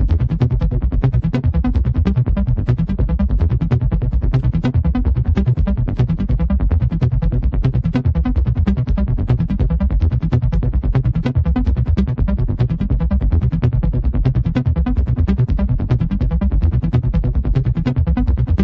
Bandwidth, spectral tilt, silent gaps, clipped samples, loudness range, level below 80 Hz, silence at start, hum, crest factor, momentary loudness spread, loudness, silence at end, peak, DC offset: 5.4 kHz; -10.5 dB/octave; none; under 0.1%; 0 LU; -18 dBFS; 0 s; none; 14 dB; 2 LU; -18 LUFS; 0 s; -2 dBFS; under 0.1%